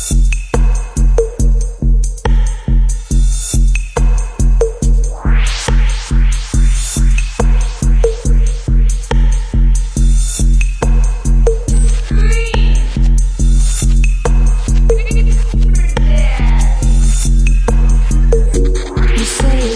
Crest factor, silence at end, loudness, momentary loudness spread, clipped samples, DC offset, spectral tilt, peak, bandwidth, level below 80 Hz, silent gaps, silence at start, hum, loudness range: 10 dB; 0 s; -15 LUFS; 2 LU; under 0.1%; under 0.1%; -5.5 dB/octave; 0 dBFS; 11 kHz; -10 dBFS; none; 0 s; none; 2 LU